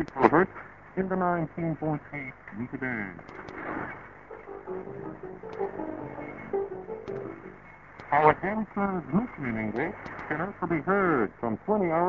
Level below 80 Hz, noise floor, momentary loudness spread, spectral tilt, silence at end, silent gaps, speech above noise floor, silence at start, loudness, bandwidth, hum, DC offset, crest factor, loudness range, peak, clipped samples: -56 dBFS; -49 dBFS; 19 LU; -9.5 dB/octave; 0 s; none; 20 dB; 0 s; -30 LUFS; 7 kHz; none; under 0.1%; 26 dB; 9 LU; -2 dBFS; under 0.1%